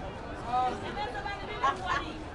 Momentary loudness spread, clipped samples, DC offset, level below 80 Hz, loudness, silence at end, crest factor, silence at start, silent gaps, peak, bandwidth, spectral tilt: 7 LU; under 0.1%; under 0.1%; -48 dBFS; -33 LUFS; 0 s; 18 dB; 0 s; none; -16 dBFS; 11.5 kHz; -4.5 dB/octave